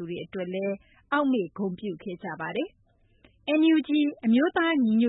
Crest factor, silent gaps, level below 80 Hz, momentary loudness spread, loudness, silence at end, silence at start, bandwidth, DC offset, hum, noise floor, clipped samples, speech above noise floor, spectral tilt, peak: 14 dB; none; -66 dBFS; 14 LU; -26 LUFS; 0 s; 0 s; 4 kHz; under 0.1%; none; -61 dBFS; under 0.1%; 35 dB; -10 dB/octave; -12 dBFS